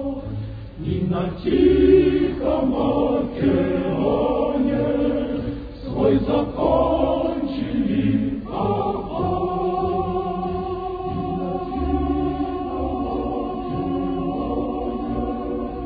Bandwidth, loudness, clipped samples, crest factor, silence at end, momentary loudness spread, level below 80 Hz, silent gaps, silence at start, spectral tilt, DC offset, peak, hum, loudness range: 5 kHz; -22 LUFS; under 0.1%; 16 dB; 0 s; 8 LU; -36 dBFS; none; 0 s; -11 dB/octave; under 0.1%; -4 dBFS; none; 6 LU